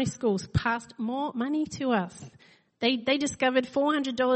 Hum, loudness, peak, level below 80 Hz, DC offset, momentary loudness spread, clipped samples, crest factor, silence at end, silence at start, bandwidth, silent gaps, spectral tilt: none; -28 LUFS; -10 dBFS; -52 dBFS; under 0.1%; 6 LU; under 0.1%; 16 dB; 0 s; 0 s; 8.8 kHz; none; -5 dB/octave